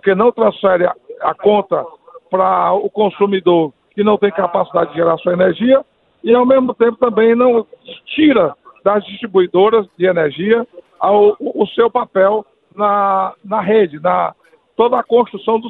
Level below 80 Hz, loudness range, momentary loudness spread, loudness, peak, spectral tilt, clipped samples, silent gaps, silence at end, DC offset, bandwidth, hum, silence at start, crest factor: -58 dBFS; 2 LU; 8 LU; -14 LUFS; 0 dBFS; -10 dB/octave; under 0.1%; none; 0 s; under 0.1%; 4.1 kHz; none; 0.05 s; 14 dB